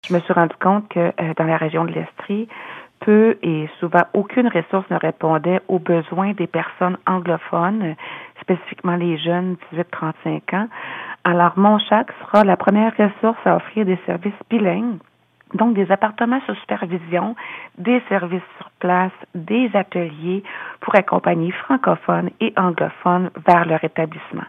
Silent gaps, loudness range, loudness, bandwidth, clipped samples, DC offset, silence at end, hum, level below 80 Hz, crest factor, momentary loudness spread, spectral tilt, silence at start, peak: none; 5 LU; -19 LUFS; 5.8 kHz; under 0.1%; under 0.1%; 0 s; none; -72 dBFS; 18 dB; 11 LU; -9 dB/octave; 0.05 s; 0 dBFS